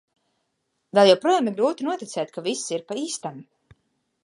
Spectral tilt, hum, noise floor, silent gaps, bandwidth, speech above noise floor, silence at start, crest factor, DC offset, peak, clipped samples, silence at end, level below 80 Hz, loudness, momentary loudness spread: -4 dB/octave; none; -75 dBFS; none; 11.5 kHz; 53 dB; 0.95 s; 22 dB; under 0.1%; -2 dBFS; under 0.1%; 0.8 s; -74 dBFS; -23 LUFS; 14 LU